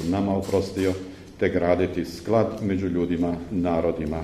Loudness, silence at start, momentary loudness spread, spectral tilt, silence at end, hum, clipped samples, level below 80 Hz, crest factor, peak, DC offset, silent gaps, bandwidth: -25 LUFS; 0 s; 4 LU; -7 dB/octave; 0 s; none; under 0.1%; -46 dBFS; 18 dB; -6 dBFS; under 0.1%; none; 14.5 kHz